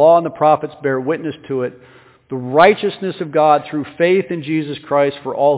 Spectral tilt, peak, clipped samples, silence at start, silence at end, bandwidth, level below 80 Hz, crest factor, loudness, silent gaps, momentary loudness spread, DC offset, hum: -10 dB/octave; 0 dBFS; under 0.1%; 0 s; 0 s; 4 kHz; -60 dBFS; 16 dB; -16 LUFS; none; 12 LU; under 0.1%; none